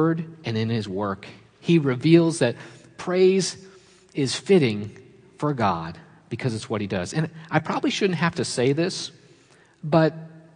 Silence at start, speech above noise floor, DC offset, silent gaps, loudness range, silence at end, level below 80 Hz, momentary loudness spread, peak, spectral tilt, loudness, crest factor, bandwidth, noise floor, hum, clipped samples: 0 s; 33 dB; under 0.1%; none; 4 LU; 0.15 s; -64 dBFS; 17 LU; -4 dBFS; -6 dB/octave; -23 LUFS; 20 dB; 10.5 kHz; -55 dBFS; none; under 0.1%